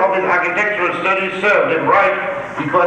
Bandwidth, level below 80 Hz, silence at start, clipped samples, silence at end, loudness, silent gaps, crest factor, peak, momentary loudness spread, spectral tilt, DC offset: 9.2 kHz; -54 dBFS; 0 s; under 0.1%; 0 s; -15 LUFS; none; 14 dB; -2 dBFS; 6 LU; -5.5 dB/octave; under 0.1%